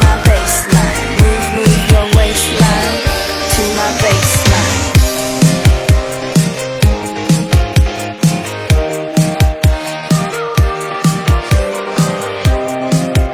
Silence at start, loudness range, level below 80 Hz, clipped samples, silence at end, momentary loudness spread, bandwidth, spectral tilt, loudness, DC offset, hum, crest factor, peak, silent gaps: 0 s; 3 LU; -18 dBFS; under 0.1%; 0 s; 5 LU; 16 kHz; -4.5 dB/octave; -13 LUFS; under 0.1%; none; 12 dB; 0 dBFS; none